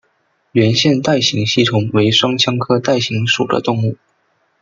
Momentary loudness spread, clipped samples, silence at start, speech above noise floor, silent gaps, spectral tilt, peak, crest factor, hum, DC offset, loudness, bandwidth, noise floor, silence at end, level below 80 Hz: 6 LU; under 0.1%; 0.55 s; 47 dB; none; -5 dB/octave; 0 dBFS; 14 dB; none; under 0.1%; -14 LUFS; 7.6 kHz; -62 dBFS; 0.7 s; -54 dBFS